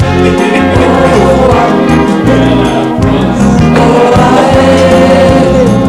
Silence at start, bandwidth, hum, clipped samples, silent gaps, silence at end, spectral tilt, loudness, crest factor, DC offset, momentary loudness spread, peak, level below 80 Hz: 0 s; 14 kHz; none; 4%; none; 0 s; -6.5 dB/octave; -6 LUFS; 6 dB; under 0.1%; 3 LU; 0 dBFS; -22 dBFS